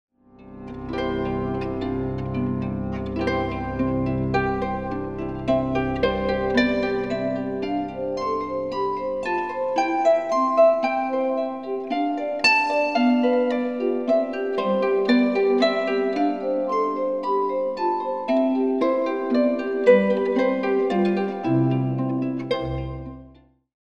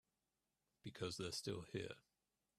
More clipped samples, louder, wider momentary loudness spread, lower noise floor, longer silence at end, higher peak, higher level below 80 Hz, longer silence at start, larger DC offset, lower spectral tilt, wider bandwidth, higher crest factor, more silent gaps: neither; first, -23 LUFS vs -49 LUFS; second, 8 LU vs 13 LU; second, -51 dBFS vs under -90 dBFS; about the same, 0.5 s vs 0.6 s; first, -4 dBFS vs -32 dBFS; first, -44 dBFS vs -78 dBFS; second, 0.4 s vs 0.85 s; first, 0.2% vs under 0.1%; first, -7 dB/octave vs -4 dB/octave; second, 9.6 kHz vs 14 kHz; about the same, 18 dB vs 20 dB; neither